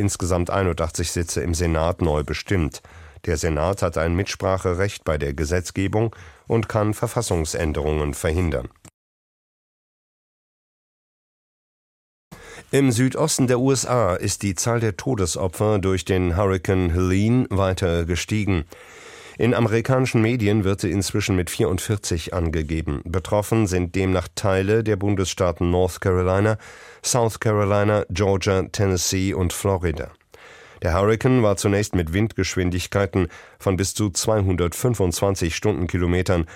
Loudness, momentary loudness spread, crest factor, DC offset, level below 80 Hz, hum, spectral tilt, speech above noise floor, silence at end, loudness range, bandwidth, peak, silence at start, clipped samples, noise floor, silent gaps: -22 LUFS; 5 LU; 18 dB; under 0.1%; -38 dBFS; none; -5.5 dB/octave; 25 dB; 0 s; 3 LU; 16 kHz; -4 dBFS; 0 s; under 0.1%; -46 dBFS; 8.94-12.31 s